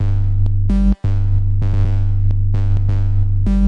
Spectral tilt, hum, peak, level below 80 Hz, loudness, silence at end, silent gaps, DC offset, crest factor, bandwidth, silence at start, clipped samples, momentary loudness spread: -10 dB/octave; none; -4 dBFS; -18 dBFS; -18 LUFS; 0 s; none; under 0.1%; 10 dB; 4.1 kHz; 0 s; under 0.1%; 1 LU